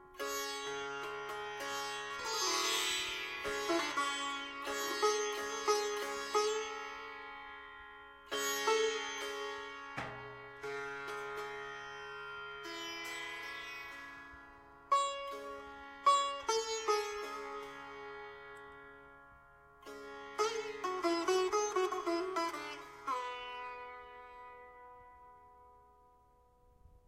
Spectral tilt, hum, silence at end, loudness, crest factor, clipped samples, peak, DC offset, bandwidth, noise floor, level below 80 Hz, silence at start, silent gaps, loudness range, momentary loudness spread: -1 dB/octave; none; 0.1 s; -37 LUFS; 22 dB; under 0.1%; -16 dBFS; under 0.1%; 16 kHz; -67 dBFS; -70 dBFS; 0 s; none; 9 LU; 19 LU